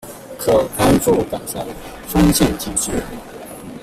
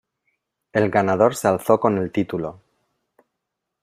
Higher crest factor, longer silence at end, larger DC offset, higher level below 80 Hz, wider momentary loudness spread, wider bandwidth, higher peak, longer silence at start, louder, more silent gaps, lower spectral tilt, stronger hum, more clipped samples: about the same, 16 dB vs 20 dB; second, 0 s vs 1.3 s; neither; first, -34 dBFS vs -60 dBFS; first, 19 LU vs 9 LU; about the same, 16 kHz vs 15.5 kHz; about the same, -2 dBFS vs -2 dBFS; second, 0.05 s vs 0.75 s; first, -17 LUFS vs -20 LUFS; neither; second, -5 dB/octave vs -6.5 dB/octave; neither; neither